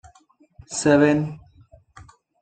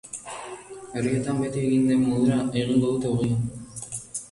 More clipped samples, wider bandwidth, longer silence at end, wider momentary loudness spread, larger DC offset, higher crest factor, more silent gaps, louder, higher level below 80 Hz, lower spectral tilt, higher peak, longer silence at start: neither; second, 9.2 kHz vs 11.5 kHz; first, 0.4 s vs 0.05 s; about the same, 17 LU vs 15 LU; neither; about the same, 20 dB vs 16 dB; neither; first, -20 LUFS vs -25 LUFS; about the same, -56 dBFS vs -52 dBFS; about the same, -5.5 dB/octave vs -6.5 dB/octave; first, -4 dBFS vs -10 dBFS; first, 0.7 s vs 0.05 s